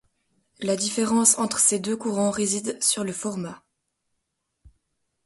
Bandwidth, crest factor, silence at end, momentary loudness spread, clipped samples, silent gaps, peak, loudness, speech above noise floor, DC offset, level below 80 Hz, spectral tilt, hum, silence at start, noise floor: 12 kHz; 24 dB; 0.55 s; 12 LU; under 0.1%; none; -2 dBFS; -22 LUFS; 54 dB; under 0.1%; -64 dBFS; -3 dB/octave; none; 0.6 s; -78 dBFS